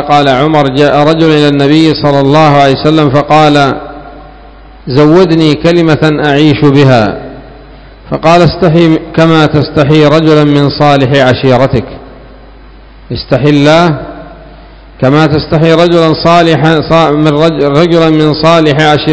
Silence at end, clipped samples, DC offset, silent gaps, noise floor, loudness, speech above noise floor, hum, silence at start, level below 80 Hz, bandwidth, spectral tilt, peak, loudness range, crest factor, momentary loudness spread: 0 s; 9%; 0.8%; none; -32 dBFS; -6 LUFS; 27 dB; none; 0 s; -32 dBFS; 8 kHz; -7 dB/octave; 0 dBFS; 3 LU; 6 dB; 7 LU